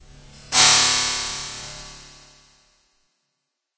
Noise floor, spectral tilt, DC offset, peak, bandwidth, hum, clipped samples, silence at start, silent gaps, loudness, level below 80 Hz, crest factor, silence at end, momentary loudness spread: -79 dBFS; 0.5 dB/octave; under 0.1%; -2 dBFS; 8 kHz; none; under 0.1%; 0.5 s; none; -16 LUFS; -50 dBFS; 22 dB; 1.75 s; 24 LU